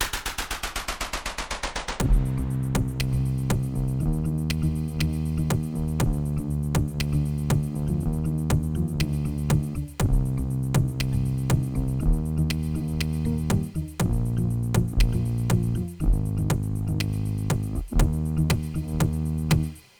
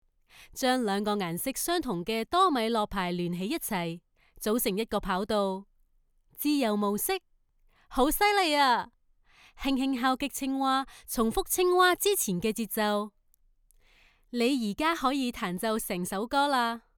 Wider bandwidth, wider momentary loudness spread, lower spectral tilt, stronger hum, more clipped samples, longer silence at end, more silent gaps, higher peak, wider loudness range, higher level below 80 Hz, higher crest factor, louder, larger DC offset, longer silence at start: about the same, over 20 kHz vs over 20 kHz; second, 4 LU vs 9 LU; first, -6 dB/octave vs -3.5 dB/octave; neither; neither; about the same, 0.2 s vs 0.2 s; neither; first, -8 dBFS vs -12 dBFS; second, 1 LU vs 4 LU; first, -30 dBFS vs -52 dBFS; about the same, 16 dB vs 18 dB; about the same, -26 LUFS vs -28 LUFS; neither; second, 0 s vs 0.4 s